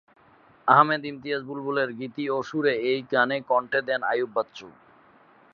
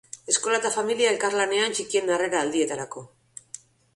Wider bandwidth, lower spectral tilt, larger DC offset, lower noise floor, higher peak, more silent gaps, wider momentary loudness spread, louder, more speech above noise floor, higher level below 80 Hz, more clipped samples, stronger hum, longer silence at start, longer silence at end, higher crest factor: second, 7 kHz vs 11.5 kHz; first, -6 dB/octave vs -1.5 dB/octave; neither; first, -57 dBFS vs -47 dBFS; first, -2 dBFS vs -8 dBFS; neither; second, 12 LU vs 19 LU; about the same, -25 LUFS vs -24 LUFS; first, 32 dB vs 22 dB; about the same, -74 dBFS vs -70 dBFS; neither; neither; first, 0.65 s vs 0.15 s; first, 0.85 s vs 0.4 s; first, 24 dB vs 18 dB